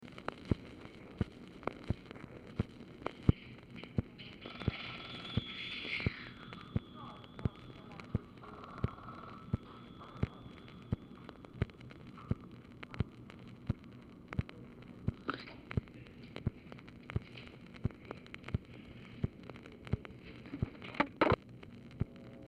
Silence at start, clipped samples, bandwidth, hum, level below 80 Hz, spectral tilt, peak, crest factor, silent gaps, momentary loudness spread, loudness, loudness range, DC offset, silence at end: 0 s; under 0.1%; 9.8 kHz; none; -52 dBFS; -7.5 dB/octave; -12 dBFS; 30 dB; none; 15 LU; -42 LUFS; 6 LU; under 0.1%; 0 s